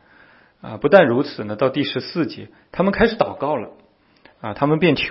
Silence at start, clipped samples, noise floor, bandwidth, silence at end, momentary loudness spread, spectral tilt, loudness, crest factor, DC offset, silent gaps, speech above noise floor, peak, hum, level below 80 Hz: 0.65 s; under 0.1%; -53 dBFS; 5.8 kHz; 0 s; 20 LU; -9 dB/octave; -19 LUFS; 20 dB; under 0.1%; none; 34 dB; 0 dBFS; none; -46 dBFS